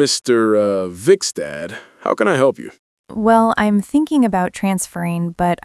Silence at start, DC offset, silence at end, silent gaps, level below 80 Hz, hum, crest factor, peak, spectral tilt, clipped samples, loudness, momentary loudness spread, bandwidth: 0 s; under 0.1%; 0.1 s; 2.79-3.04 s; -50 dBFS; none; 16 dB; 0 dBFS; -5 dB/octave; under 0.1%; -17 LUFS; 12 LU; 12 kHz